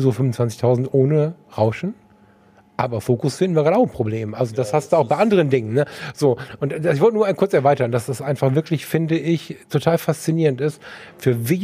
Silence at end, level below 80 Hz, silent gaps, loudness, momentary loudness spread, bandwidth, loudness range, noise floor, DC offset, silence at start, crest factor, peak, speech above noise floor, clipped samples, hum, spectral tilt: 0 s; -58 dBFS; none; -20 LUFS; 8 LU; 15.5 kHz; 3 LU; -52 dBFS; under 0.1%; 0 s; 18 dB; -2 dBFS; 33 dB; under 0.1%; none; -7 dB/octave